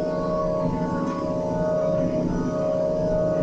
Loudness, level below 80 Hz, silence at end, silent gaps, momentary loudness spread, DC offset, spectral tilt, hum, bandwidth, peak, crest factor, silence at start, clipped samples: -24 LUFS; -40 dBFS; 0 s; none; 3 LU; under 0.1%; -8.5 dB/octave; none; 8 kHz; -12 dBFS; 12 dB; 0 s; under 0.1%